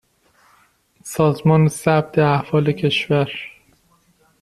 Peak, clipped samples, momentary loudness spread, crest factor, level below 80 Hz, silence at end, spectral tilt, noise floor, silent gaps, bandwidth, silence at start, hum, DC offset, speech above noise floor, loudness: -2 dBFS; under 0.1%; 15 LU; 18 dB; -54 dBFS; 0.95 s; -6.5 dB/octave; -59 dBFS; none; 13.5 kHz; 1.05 s; none; under 0.1%; 41 dB; -18 LUFS